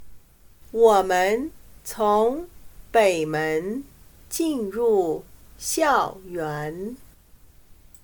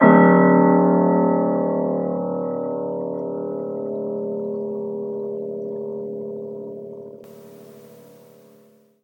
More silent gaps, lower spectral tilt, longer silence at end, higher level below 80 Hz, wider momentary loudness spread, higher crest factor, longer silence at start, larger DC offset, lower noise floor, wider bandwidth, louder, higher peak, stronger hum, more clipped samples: neither; second, -4 dB/octave vs -10.5 dB/octave; second, 1 s vs 1.2 s; first, -52 dBFS vs -74 dBFS; second, 16 LU vs 19 LU; about the same, 20 dB vs 20 dB; about the same, 0 s vs 0 s; neither; about the same, -51 dBFS vs -54 dBFS; first, 19 kHz vs 16.5 kHz; about the same, -23 LUFS vs -21 LUFS; second, -6 dBFS vs 0 dBFS; neither; neither